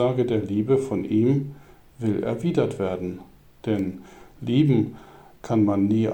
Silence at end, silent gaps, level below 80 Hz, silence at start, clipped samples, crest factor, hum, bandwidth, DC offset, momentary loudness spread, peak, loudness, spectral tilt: 0 s; none; -56 dBFS; 0 s; under 0.1%; 14 dB; none; 9.4 kHz; under 0.1%; 14 LU; -8 dBFS; -24 LUFS; -8.5 dB/octave